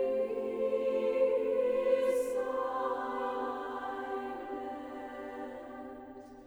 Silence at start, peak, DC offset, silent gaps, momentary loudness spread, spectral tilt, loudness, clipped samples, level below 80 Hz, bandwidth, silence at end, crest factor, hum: 0 s; -18 dBFS; under 0.1%; none; 14 LU; -5 dB/octave; -34 LUFS; under 0.1%; -68 dBFS; 13.5 kHz; 0 s; 16 dB; none